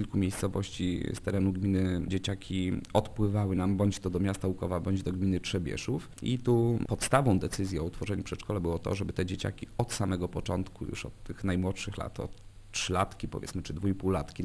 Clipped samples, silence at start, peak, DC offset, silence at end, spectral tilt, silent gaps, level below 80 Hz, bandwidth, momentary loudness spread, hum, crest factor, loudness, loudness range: under 0.1%; 0 s; -10 dBFS; under 0.1%; 0 s; -6 dB/octave; none; -48 dBFS; 11 kHz; 9 LU; none; 20 dB; -32 LUFS; 5 LU